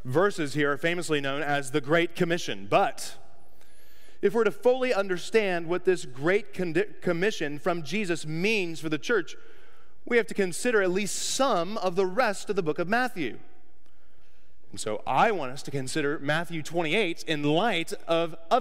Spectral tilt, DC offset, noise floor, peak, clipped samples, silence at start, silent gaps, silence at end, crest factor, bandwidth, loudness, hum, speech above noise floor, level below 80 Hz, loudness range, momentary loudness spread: -4.5 dB/octave; 2%; -64 dBFS; -8 dBFS; under 0.1%; 0.05 s; none; 0 s; 18 dB; 16 kHz; -27 LUFS; none; 37 dB; -66 dBFS; 3 LU; 6 LU